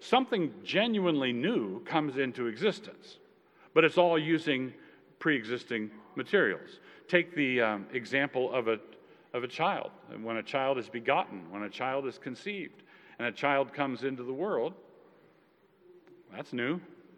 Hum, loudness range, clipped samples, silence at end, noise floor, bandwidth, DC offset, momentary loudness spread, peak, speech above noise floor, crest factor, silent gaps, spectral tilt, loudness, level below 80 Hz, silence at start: none; 5 LU; under 0.1%; 0.25 s; -65 dBFS; 10.5 kHz; under 0.1%; 13 LU; -8 dBFS; 34 dB; 24 dB; none; -6 dB/octave; -31 LUFS; under -90 dBFS; 0 s